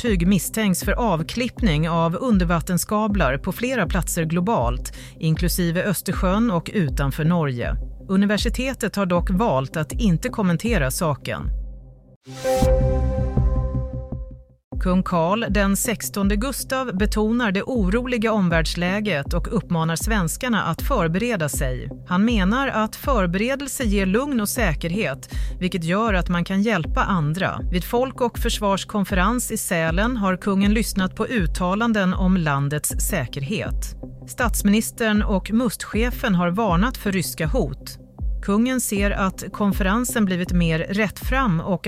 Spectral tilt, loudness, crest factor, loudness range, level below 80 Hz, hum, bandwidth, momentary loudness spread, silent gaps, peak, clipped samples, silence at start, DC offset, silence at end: -5.5 dB/octave; -22 LUFS; 14 dB; 2 LU; -30 dBFS; none; 16 kHz; 6 LU; 12.16-12.21 s, 14.64-14.71 s; -6 dBFS; under 0.1%; 0 s; under 0.1%; 0 s